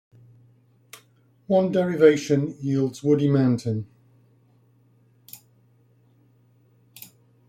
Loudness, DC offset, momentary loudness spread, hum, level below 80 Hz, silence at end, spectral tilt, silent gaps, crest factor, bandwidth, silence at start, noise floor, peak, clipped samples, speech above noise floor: -22 LUFS; under 0.1%; 27 LU; none; -66 dBFS; 2.1 s; -7.5 dB/octave; none; 22 dB; 16 kHz; 1.5 s; -60 dBFS; -4 dBFS; under 0.1%; 39 dB